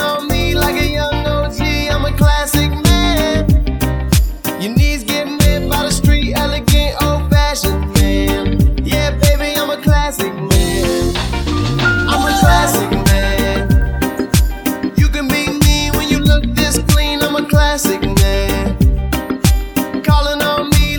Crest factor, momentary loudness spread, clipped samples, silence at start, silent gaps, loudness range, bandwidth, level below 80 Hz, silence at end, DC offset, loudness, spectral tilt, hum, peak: 14 dB; 4 LU; under 0.1%; 0 s; none; 1 LU; over 20 kHz; -18 dBFS; 0 s; under 0.1%; -14 LUFS; -5 dB/octave; none; 0 dBFS